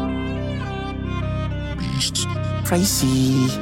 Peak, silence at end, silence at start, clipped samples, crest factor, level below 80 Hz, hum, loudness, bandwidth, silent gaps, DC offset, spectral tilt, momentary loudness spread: -6 dBFS; 0 s; 0 s; under 0.1%; 16 dB; -34 dBFS; 50 Hz at -50 dBFS; -22 LUFS; 17 kHz; none; under 0.1%; -4.5 dB/octave; 9 LU